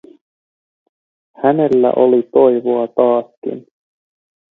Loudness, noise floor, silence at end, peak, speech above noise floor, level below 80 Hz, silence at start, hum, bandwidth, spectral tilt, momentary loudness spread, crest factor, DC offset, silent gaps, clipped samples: -14 LUFS; under -90 dBFS; 0.9 s; 0 dBFS; over 76 dB; -64 dBFS; 1.4 s; none; 4 kHz; -9.5 dB/octave; 15 LU; 16 dB; under 0.1%; 3.37-3.42 s; under 0.1%